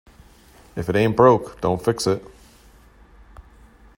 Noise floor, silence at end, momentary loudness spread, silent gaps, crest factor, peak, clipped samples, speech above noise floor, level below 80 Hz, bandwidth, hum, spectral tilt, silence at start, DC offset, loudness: -50 dBFS; 0.55 s; 13 LU; none; 22 dB; -2 dBFS; under 0.1%; 31 dB; -48 dBFS; 16 kHz; none; -6 dB/octave; 0.75 s; under 0.1%; -20 LUFS